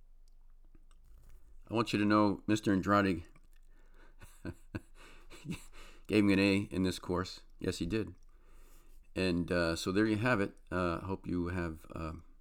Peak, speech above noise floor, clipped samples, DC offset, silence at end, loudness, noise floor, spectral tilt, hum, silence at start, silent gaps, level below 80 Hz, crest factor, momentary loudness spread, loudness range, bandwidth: -16 dBFS; 24 dB; under 0.1%; under 0.1%; 0.1 s; -33 LUFS; -56 dBFS; -6 dB/octave; none; 0.1 s; none; -54 dBFS; 20 dB; 17 LU; 4 LU; 16.5 kHz